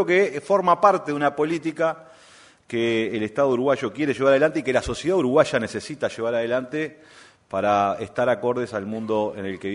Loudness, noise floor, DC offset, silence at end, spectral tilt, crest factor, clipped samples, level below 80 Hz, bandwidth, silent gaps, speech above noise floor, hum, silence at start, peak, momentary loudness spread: -22 LUFS; -51 dBFS; under 0.1%; 0 s; -5.5 dB/octave; 20 dB; under 0.1%; -52 dBFS; 11 kHz; none; 29 dB; none; 0 s; -2 dBFS; 10 LU